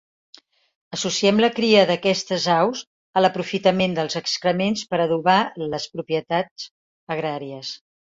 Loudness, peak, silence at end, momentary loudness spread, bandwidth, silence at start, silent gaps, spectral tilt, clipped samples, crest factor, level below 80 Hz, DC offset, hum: -21 LUFS; -2 dBFS; 0.25 s; 15 LU; 7.8 kHz; 0.9 s; 2.87-3.13 s, 6.51-6.56 s, 6.71-7.07 s; -4.5 dB/octave; under 0.1%; 20 dB; -62 dBFS; under 0.1%; none